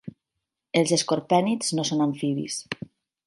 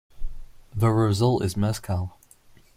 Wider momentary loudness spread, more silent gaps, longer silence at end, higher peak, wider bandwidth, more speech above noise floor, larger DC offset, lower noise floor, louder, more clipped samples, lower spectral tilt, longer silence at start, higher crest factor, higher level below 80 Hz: second, 14 LU vs 22 LU; neither; second, 0.55 s vs 0.7 s; about the same, -6 dBFS vs -8 dBFS; second, 11.5 kHz vs 15.5 kHz; first, 60 dB vs 31 dB; neither; first, -84 dBFS vs -53 dBFS; about the same, -24 LUFS vs -24 LUFS; neither; second, -4.5 dB/octave vs -7 dB/octave; about the same, 0.05 s vs 0.15 s; about the same, 20 dB vs 16 dB; second, -68 dBFS vs -40 dBFS